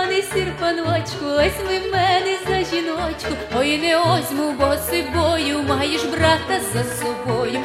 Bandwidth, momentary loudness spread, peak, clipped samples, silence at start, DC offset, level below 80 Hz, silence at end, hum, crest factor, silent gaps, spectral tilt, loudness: 16 kHz; 6 LU; -2 dBFS; under 0.1%; 0 s; under 0.1%; -40 dBFS; 0 s; none; 18 dB; none; -4.5 dB/octave; -20 LUFS